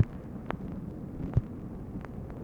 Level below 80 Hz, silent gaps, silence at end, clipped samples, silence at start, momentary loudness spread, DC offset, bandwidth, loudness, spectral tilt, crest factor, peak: -44 dBFS; none; 0 s; under 0.1%; 0 s; 9 LU; under 0.1%; 7.2 kHz; -37 LUFS; -9.5 dB/octave; 24 dB; -10 dBFS